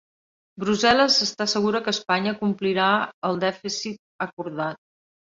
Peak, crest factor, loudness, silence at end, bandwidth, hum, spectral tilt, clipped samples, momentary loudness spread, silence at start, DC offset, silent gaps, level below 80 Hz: -4 dBFS; 20 dB; -23 LUFS; 0.45 s; 7.8 kHz; none; -3.5 dB/octave; under 0.1%; 13 LU; 0.55 s; under 0.1%; 3.14-3.22 s, 3.99-4.19 s, 4.33-4.37 s; -62 dBFS